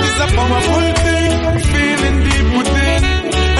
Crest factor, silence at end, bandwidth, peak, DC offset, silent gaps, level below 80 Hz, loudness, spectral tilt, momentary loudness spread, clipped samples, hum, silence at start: 10 dB; 0 s; 11.5 kHz; -4 dBFS; under 0.1%; none; -18 dBFS; -14 LUFS; -5 dB/octave; 1 LU; under 0.1%; none; 0 s